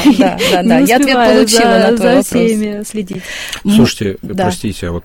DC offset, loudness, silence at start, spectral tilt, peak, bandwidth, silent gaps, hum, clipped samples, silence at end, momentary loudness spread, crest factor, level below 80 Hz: under 0.1%; -11 LUFS; 0 s; -4.5 dB/octave; 0 dBFS; 17 kHz; none; none; under 0.1%; 0.05 s; 13 LU; 12 dB; -38 dBFS